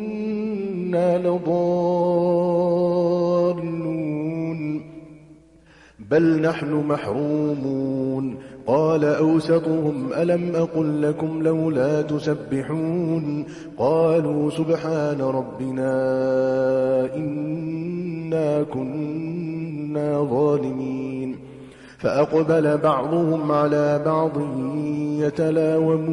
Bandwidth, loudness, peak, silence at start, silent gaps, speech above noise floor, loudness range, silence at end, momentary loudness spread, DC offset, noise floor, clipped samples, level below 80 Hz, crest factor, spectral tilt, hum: 11 kHz; -22 LUFS; -8 dBFS; 0 s; none; 30 dB; 4 LU; 0 s; 9 LU; under 0.1%; -51 dBFS; under 0.1%; -60 dBFS; 14 dB; -8.5 dB/octave; none